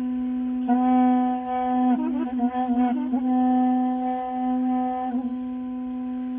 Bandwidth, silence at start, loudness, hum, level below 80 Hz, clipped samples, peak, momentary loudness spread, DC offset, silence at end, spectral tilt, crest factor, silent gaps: 3.5 kHz; 0 s; -24 LUFS; none; -58 dBFS; under 0.1%; -12 dBFS; 9 LU; under 0.1%; 0 s; -5.5 dB/octave; 12 dB; none